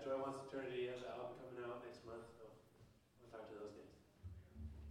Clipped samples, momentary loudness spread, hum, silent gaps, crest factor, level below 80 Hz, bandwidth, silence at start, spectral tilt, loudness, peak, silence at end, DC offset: under 0.1%; 19 LU; none; none; 18 dB; -66 dBFS; 16 kHz; 0 s; -6 dB/octave; -51 LUFS; -32 dBFS; 0 s; under 0.1%